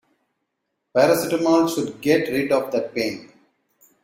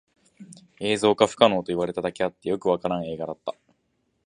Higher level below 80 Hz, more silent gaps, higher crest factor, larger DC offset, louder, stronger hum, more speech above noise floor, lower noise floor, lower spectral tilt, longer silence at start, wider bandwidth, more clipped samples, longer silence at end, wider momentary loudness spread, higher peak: about the same, -62 dBFS vs -60 dBFS; neither; second, 18 dB vs 24 dB; neither; first, -21 LUFS vs -24 LUFS; neither; first, 57 dB vs 48 dB; first, -77 dBFS vs -72 dBFS; about the same, -5 dB/octave vs -5 dB/octave; first, 0.95 s vs 0.4 s; first, 16.5 kHz vs 10.5 kHz; neither; about the same, 0.8 s vs 0.75 s; second, 8 LU vs 13 LU; second, -4 dBFS vs 0 dBFS